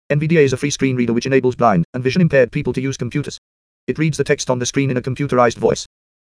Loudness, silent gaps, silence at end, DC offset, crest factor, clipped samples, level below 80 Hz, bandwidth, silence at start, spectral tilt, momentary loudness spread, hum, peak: -17 LUFS; 1.85-1.93 s, 3.38-3.87 s; 0.5 s; under 0.1%; 16 dB; under 0.1%; -46 dBFS; 11 kHz; 0.1 s; -5.5 dB/octave; 10 LU; none; -2 dBFS